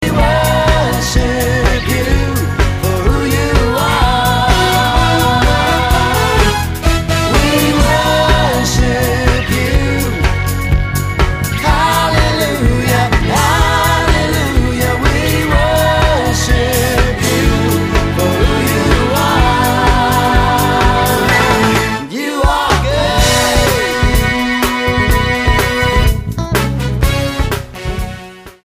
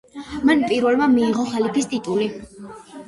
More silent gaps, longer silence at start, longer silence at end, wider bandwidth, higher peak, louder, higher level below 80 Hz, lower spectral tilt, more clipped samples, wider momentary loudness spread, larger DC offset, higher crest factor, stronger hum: neither; second, 0 s vs 0.15 s; about the same, 0.15 s vs 0.05 s; first, 15.5 kHz vs 11.5 kHz; first, 0 dBFS vs -4 dBFS; first, -12 LUFS vs -19 LUFS; first, -18 dBFS vs -52 dBFS; about the same, -4.5 dB/octave vs -5 dB/octave; neither; second, 4 LU vs 20 LU; neither; about the same, 12 dB vs 16 dB; neither